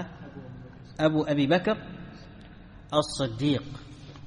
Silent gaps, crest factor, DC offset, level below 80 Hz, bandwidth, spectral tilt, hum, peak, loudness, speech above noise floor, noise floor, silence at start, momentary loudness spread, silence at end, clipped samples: none; 20 dB; under 0.1%; -52 dBFS; 10.5 kHz; -6 dB/octave; none; -10 dBFS; -27 LUFS; 21 dB; -47 dBFS; 0 s; 22 LU; 0 s; under 0.1%